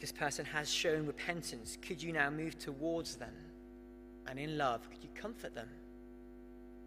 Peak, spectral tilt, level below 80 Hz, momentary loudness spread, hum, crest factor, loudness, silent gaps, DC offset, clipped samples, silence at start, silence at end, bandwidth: -16 dBFS; -3.5 dB/octave; -60 dBFS; 20 LU; 50 Hz at -60 dBFS; 24 dB; -39 LUFS; none; under 0.1%; under 0.1%; 0 s; 0 s; 15.5 kHz